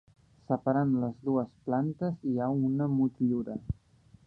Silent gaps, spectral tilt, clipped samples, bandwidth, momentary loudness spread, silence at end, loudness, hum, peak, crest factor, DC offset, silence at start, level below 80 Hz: none; -11.5 dB/octave; under 0.1%; 4.6 kHz; 8 LU; 0.55 s; -31 LUFS; none; -12 dBFS; 18 dB; under 0.1%; 0.5 s; -54 dBFS